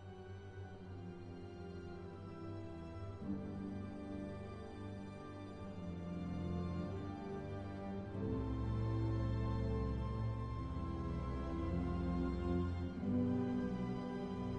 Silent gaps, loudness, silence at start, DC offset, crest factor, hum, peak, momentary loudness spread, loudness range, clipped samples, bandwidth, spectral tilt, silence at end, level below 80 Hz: none; -43 LUFS; 0 s; under 0.1%; 14 dB; none; -28 dBFS; 12 LU; 8 LU; under 0.1%; 8.8 kHz; -9 dB/octave; 0 s; -50 dBFS